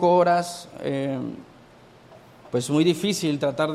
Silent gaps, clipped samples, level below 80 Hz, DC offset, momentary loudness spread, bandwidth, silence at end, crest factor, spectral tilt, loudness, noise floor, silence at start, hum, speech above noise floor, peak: none; under 0.1%; -64 dBFS; under 0.1%; 13 LU; 15 kHz; 0 s; 16 dB; -5.5 dB/octave; -24 LUFS; -50 dBFS; 0 s; none; 28 dB; -8 dBFS